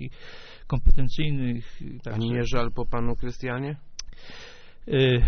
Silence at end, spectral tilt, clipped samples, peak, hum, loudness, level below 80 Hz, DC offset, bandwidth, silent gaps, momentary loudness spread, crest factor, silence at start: 0 s; -5.5 dB/octave; under 0.1%; -4 dBFS; none; -28 LUFS; -28 dBFS; under 0.1%; 6.4 kHz; none; 19 LU; 18 dB; 0 s